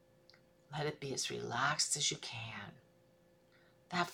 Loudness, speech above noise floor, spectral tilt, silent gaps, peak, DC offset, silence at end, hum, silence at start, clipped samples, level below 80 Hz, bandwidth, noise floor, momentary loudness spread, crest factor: -37 LUFS; 30 dB; -2 dB/octave; none; -20 dBFS; under 0.1%; 0 s; none; 0.7 s; under 0.1%; -76 dBFS; 18 kHz; -68 dBFS; 15 LU; 22 dB